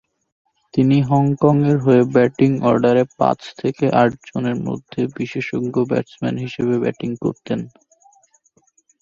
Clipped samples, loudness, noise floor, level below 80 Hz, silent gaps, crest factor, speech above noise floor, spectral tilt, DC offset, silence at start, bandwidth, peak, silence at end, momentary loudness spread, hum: under 0.1%; -18 LUFS; -60 dBFS; -56 dBFS; none; 18 dB; 42 dB; -8.5 dB/octave; under 0.1%; 0.75 s; 7.4 kHz; 0 dBFS; 1.35 s; 10 LU; none